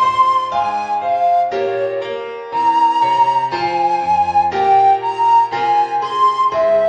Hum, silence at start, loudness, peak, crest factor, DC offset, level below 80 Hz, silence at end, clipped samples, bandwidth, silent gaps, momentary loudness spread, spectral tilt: none; 0 s; -15 LUFS; -4 dBFS; 12 dB; under 0.1%; -56 dBFS; 0 s; under 0.1%; 9.6 kHz; none; 6 LU; -4.5 dB/octave